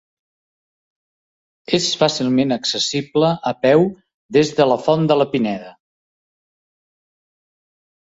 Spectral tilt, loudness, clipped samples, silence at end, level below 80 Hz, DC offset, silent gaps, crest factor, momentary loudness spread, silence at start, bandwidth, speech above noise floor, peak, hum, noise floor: -5 dB/octave; -17 LUFS; under 0.1%; 2.4 s; -60 dBFS; under 0.1%; 4.14-4.29 s; 18 dB; 6 LU; 1.7 s; 8 kHz; over 73 dB; -2 dBFS; none; under -90 dBFS